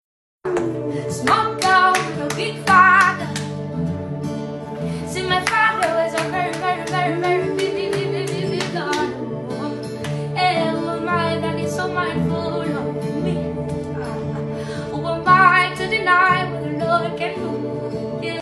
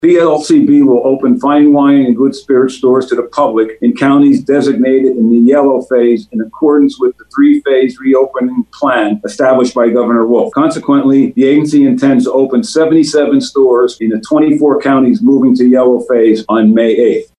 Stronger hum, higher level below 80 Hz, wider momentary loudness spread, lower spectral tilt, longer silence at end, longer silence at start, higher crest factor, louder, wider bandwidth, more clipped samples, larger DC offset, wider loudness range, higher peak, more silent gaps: neither; about the same, -50 dBFS vs -54 dBFS; first, 12 LU vs 5 LU; second, -5 dB/octave vs -6.5 dB/octave; second, 0 s vs 0.15 s; first, 0.45 s vs 0 s; first, 18 dB vs 8 dB; second, -20 LUFS vs -9 LUFS; first, 13 kHz vs 10.5 kHz; neither; neither; first, 6 LU vs 2 LU; about the same, -2 dBFS vs 0 dBFS; neither